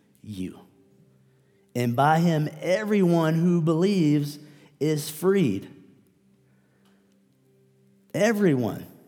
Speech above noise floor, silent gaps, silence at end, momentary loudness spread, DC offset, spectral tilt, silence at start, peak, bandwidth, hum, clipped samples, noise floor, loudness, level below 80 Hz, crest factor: 40 dB; none; 0.2 s; 15 LU; under 0.1%; -7 dB/octave; 0.25 s; -8 dBFS; 18.5 kHz; none; under 0.1%; -62 dBFS; -24 LUFS; -72 dBFS; 18 dB